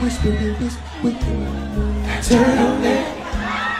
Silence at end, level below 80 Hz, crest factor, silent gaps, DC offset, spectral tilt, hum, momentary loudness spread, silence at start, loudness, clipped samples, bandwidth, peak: 0 s; -26 dBFS; 16 dB; none; under 0.1%; -5.5 dB/octave; none; 10 LU; 0 s; -20 LUFS; under 0.1%; 14.5 kHz; -2 dBFS